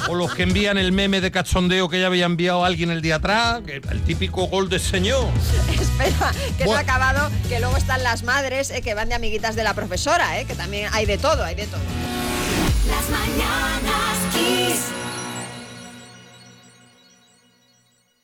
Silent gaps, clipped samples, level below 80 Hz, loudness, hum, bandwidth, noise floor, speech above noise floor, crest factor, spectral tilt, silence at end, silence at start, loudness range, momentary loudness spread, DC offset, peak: none; under 0.1%; -30 dBFS; -21 LUFS; none; 18.5 kHz; -61 dBFS; 41 dB; 12 dB; -4.5 dB/octave; 1.7 s; 0 s; 4 LU; 8 LU; under 0.1%; -8 dBFS